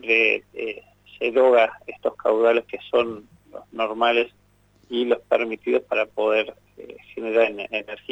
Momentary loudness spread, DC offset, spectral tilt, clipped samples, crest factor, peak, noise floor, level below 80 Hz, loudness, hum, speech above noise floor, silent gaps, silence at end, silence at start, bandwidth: 15 LU; under 0.1%; -5 dB/octave; under 0.1%; 16 dB; -6 dBFS; -59 dBFS; -64 dBFS; -22 LUFS; 50 Hz at -60 dBFS; 37 dB; none; 0.15 s; 0.05 s; 8 kHz